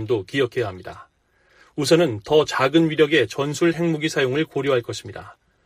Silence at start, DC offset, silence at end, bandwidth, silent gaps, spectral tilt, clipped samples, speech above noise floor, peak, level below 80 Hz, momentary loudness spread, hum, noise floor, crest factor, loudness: 0 s; under 0.1%; 0.35 s; 15.5 kHz; none; -5 dB/octave; under 0.1%; 39 dB; -2 dBFS; -58 dBFS; 16 LU; none; -60 dBFS; 18 dB; -20 LUFS